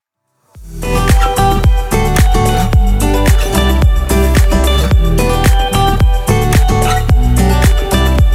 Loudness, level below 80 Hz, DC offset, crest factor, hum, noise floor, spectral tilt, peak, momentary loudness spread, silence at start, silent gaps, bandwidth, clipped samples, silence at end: -12 LUFS; -12 dBFS; under 0.1%; 10 dB; none; -61 dBFS; -5.5 dB/octave; 0 dBFS; 2 LU; 0.55 s; none; 16.5 kHz; under 0.1%; 0 s